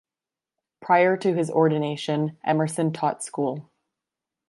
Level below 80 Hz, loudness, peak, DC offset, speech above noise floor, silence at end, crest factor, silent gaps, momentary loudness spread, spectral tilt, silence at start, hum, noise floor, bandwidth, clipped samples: -74 dBFS; -23 LUFS; -6 dBFS; under 0.1%; over 67 dB; 0.85 s; 18 dB; none; 9 LU; -6 dB/octave; 0.8 s; none; under -90 dBFS; 11.5 kHz; under 0.1%